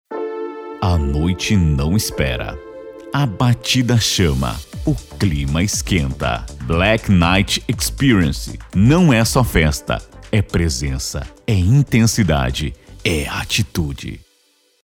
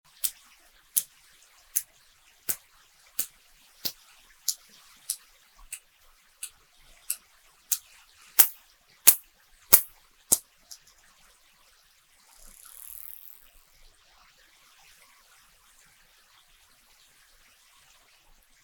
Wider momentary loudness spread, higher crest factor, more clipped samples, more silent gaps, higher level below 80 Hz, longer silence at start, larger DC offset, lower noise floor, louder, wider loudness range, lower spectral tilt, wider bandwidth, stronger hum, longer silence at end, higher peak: second, 11 LU vs 28 LU; second, 16 dB vs 32 dB; neither; neither; first, -28 dBFS vs -66 dBFS; second, 0.1 s vs 0.25 s; neither; about the same, -59 dBFS vs -62 dBFS; first, -17 LUFS vs -25 LUFS; second, 3 LU vs 25 LU; first, -5 dB/octave vs 1.5 dB/octave; second, 17.5 kHz vs 19.5 kHz; neither; second, 0.75 s vs 8.25 s; about the same, -2 dBFS vs 0 dBFS